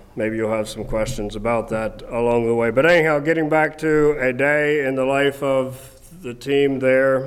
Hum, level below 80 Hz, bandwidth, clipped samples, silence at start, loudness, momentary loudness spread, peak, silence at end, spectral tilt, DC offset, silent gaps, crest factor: none; -40 dBFS; 14.5 kHz; under 0.1%; 0.15 s; -19 LUFS; 10 LU; -6 dBFS; 0 s; -6 dB/octave; under 0.1%; none; 14 dB